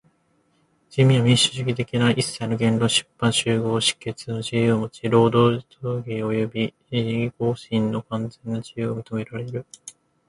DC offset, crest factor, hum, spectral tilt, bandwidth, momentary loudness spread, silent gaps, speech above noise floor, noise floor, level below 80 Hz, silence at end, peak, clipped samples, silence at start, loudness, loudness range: under 0.1%; 18 dB; none; -5 dB/octave; 11.5 kHz; 13 LU; none; 43 dB; -65 dBFS; -56 dBFS; 0.4 s; -4 dBFS; under 0.1%; 0.9 s; -22 LUFS; 6 LU